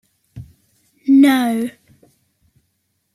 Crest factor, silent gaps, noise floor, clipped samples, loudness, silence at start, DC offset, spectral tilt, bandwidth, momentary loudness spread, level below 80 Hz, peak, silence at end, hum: 16 dB; none; -69 dBFS; under 0.1%; -15 LUFS; 0.35 s; under 0.1%; -5 dB/octave; 14.5 kHz; 16 LU; -58 dBFS; -4 dBFS; 1.45 s; none